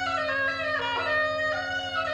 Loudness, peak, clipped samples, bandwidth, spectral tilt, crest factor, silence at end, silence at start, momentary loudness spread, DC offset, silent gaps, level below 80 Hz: -26 LUFS; -16 dBFS; under 0.1%; 10 kHz; -3.5 dB/octave; 12 dB; 0 s; 0 s; 4 LU; under 0.1%; none; -58 dBFS